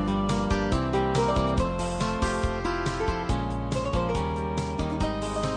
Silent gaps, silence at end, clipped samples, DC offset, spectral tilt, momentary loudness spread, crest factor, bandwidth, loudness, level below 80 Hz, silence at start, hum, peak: none; 0 s; under 0.1%; under 0.1%; -6 dB/octave; 5 LU; 14 dB; 10.5 kHz; -27 LUFS; -34 dBFS; 0 s; none; -12 dBFS